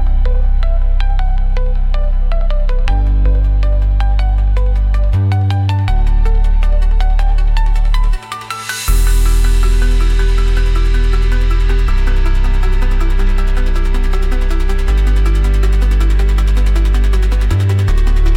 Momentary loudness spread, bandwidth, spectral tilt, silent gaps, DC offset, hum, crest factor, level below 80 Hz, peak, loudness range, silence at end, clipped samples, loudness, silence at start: 4 LU; 12.5 kHz; -6 dB/octave; none; under 0.1%; none; 8 dB; -10 dBFS; -2 dBFS; 2 LU; 0 s; under 0.1%; -16 LUFS; 0 s